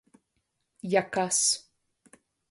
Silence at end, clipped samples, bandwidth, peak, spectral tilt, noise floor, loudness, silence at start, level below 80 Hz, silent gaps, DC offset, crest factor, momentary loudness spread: 0.9 s; under 0.1%; 12 kHz; -10 dBFS; -2 dB/octave; -78 dBFS; -26 LUFS; 0.85 s; -74 dBFS; none; under 0.1%; 22 dB; 8 LU